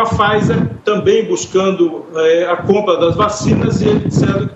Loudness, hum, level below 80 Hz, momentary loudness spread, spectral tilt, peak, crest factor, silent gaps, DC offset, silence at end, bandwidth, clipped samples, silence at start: -14 LUFS; none; -40 dBFS; 4 LU; -6 dB/octave; 0 dBFS; 14 dB; none; under 0.1%; 0 s; 8.4 kHz; under 0.1%; 0 s